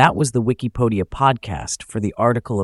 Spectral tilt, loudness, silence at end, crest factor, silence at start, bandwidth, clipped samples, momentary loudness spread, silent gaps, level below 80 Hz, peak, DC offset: -5.5 dB/octave; -20 LUFS; 0 s; 18 dB; 0 s; 12 kHz; under 0.1%; 8 LU; none; -42 dBFS; 0 dBFS; under 0.1%